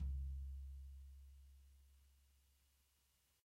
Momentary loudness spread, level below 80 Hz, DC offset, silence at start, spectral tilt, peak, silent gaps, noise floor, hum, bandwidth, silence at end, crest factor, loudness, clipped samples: 19 LU; -52 dBFS; under 0.1%; 0 s; -7 dB/octave; -38 dBFS; none; -80 dBFS; none; 13.5 kHz; 1.2 s; 14 dB; -53 LUFS; under 0.1%